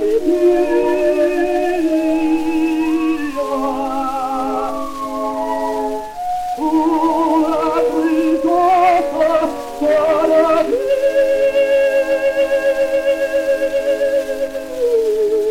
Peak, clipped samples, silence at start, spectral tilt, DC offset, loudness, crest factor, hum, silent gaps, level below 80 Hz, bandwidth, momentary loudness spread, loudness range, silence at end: -2 dBFS; under 0.1%; 0 s; -4.5 dB/octave; 0.1%; -16 LUFS; 14 dB; none; none; -44 dBFS; 16.5 kHz; 8 LU; 5 LU; 0 s